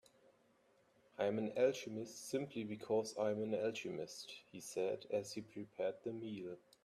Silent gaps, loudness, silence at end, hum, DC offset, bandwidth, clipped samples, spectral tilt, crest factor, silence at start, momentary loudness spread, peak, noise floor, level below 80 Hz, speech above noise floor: none; -42 LUFS; 0.25 s; none; under 0.1%; 14 kHz; under 0.1%; -5 dB/octave; 20 dB; 1.2 s; 13 LU; -22 dBFS; -74 dBFS; -84 dBFS; 32 dB